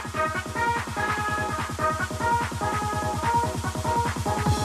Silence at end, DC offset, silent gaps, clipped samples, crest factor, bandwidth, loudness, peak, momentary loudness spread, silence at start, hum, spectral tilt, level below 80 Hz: 0 s; under 0.1%; none; under 0.1%; 14 dB; 14 kHz; -26 LUFS; -12 dBFS; 3 LU; 0 s; none; -4.5 dB/octave; -42 dBFS